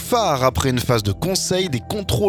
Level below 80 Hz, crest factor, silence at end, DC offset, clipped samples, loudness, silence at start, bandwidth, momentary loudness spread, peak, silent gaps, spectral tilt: -38 dBFS; 16 dB; 0 s; under 0.1%; under 0.1%; -20 LUFS; 0 s; 19 kHz; 5 LU; -2 dBFS; none; -4.5 dB/octave